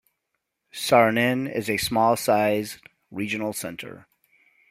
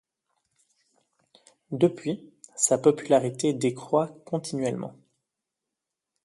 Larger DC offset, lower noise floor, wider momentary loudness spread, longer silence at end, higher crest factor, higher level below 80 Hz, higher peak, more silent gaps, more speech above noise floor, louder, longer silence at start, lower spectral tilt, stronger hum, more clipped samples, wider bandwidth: neither; second, -79 dBFS vs -86 dBFS; first, 20 LU vs 15 LU; second, 0.75 s vs 1.35 s; about the same, 22 dB vs 22 dB; first, -60 dBFS vs -72 dBFS; first, -2 dBFS vs -6 dBFS; neither; second, 56 dB vs 61 dB; first, -23 LUFS vs -26 LUFS; second, 0.75 s vs 1.7 s; about the same, -4.5 dB/octave vs -5 dB/octave; neither; neither; first, 16 kHz vs 12 kHz